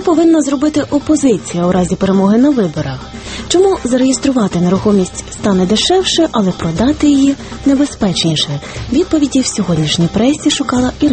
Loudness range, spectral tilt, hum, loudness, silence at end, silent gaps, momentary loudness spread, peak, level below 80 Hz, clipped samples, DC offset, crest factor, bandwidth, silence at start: 1 LU; -5 dB/octave; none; -13 LUFS; 0 s; none; 6 LU; 0 dBFS; -34 dBFS; under 0.1%; under 0.1%; 12 dB; 8.8 kHz; 0 s